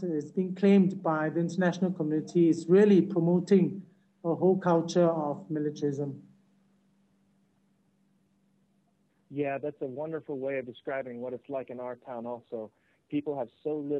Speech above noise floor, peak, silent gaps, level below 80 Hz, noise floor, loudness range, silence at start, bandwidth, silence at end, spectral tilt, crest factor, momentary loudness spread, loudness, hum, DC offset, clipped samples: 43 dB; -12 dBFS; none; -80 dBFS; -71 dBFS; 14 LU; 0 s; 8.4 kHz; 0 s; -8 dB/octave; 18 dB; 16 LU; -28 LUFS; none; under 0.1%; under 0.1%